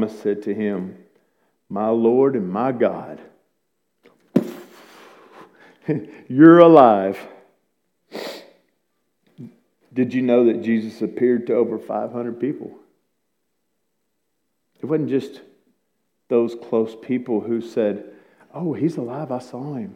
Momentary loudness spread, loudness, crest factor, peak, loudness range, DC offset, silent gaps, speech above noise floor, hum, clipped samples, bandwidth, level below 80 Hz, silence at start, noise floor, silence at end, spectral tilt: 20 LU; -19 LUFS; 20 dB; 0 dBFS; 14 LU; under 0.1%; none; 57 dB; none; under 0.1%; 8 kHz; -72 dBFS; 0 s; -75 dBFS; 0 s; -8.5 dB/octave